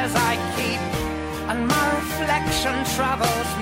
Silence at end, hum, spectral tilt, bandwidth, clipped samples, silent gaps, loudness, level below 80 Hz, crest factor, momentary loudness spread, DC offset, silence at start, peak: 0 s; none; -4 dB/octave; 16 kHz; under 0.1%; none; -22 LUFS; -40 dBFS; 16 dB; 6 LU; under 0.1%; 0 s; -6 dBFS